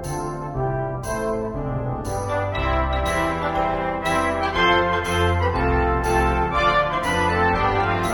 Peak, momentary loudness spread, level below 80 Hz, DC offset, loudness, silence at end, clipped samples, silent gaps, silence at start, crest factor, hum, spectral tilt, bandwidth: -6 dBFS; 8 LU; -32 dBFS; under 0.1%; -21 LUFS; 0 s; under 0.1%; none; 0 s; 16 dB; none; -5.5 dB/octave; 17.5 kHz